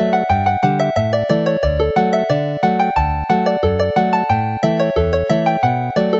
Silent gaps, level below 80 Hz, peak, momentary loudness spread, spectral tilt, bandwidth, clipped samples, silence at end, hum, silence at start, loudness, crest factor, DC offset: none; -32 dBFS; 0 dBFS; 2 LU; -7.5 dB/octave; 7.8 kHz; under 0.1%; 0 s; none; 0 s; -17 LUFS; 16 dB; under 0.1%